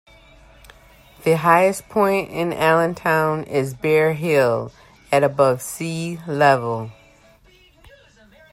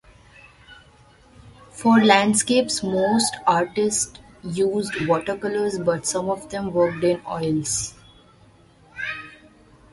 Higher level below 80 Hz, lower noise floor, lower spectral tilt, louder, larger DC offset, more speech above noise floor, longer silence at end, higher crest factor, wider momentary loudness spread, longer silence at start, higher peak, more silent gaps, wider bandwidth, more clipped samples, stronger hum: about the same, -54 dBFS vs -54 dBFS; about the same, -52 dBFS vs -53 dBFS; first, -5.5 dB/octave vs -4 dB/octave; about the same, -19 LUFS vs -21 LUFS; neither; about the same, 34 dB vs 32 dB; first, 1.6 s vs 0.6 s; about the same, 18 dB vs 22 dB; second, 10 LU vs 15 LU; first, 1.2 s vs 0.7 s; about the same, -2 dBFS vs -2 dBFS; neither; first, 16 kHz vs 11.5 kHz; neither; neither